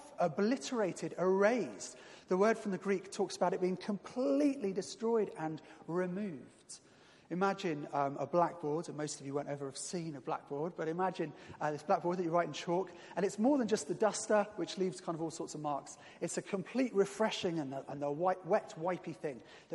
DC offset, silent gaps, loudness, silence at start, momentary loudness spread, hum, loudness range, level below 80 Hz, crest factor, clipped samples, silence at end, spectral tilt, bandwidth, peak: under 0.1%; none; -36 LUFS; 0 s; 11 LU; none; 4 LU; -82 dBFS; 20 dB; under 0.1%; 0 s; -5 dB/octave; 11.5 kHz; -16 dBFS